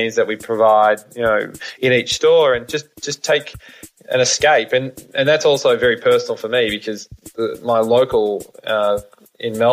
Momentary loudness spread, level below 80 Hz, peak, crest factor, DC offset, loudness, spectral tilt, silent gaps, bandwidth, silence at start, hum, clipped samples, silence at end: 13 LU; -52 dBFS; -4 dBFS; 14 dB; under 0.1%; -17 LUFS; -3 dB/octave; none; 15.5 kHz; 0 s; none; under 0.1%; 0 s